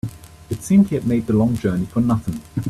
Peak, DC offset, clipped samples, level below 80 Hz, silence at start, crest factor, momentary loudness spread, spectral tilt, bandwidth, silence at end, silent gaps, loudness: -4 dBFS; under 0.1%; under 0.1%; -44 dBFS; 0.05 s; 16 dB; 14 LU; -8 dB/octave; 14 kHz; 0 s; none; -19 LUFS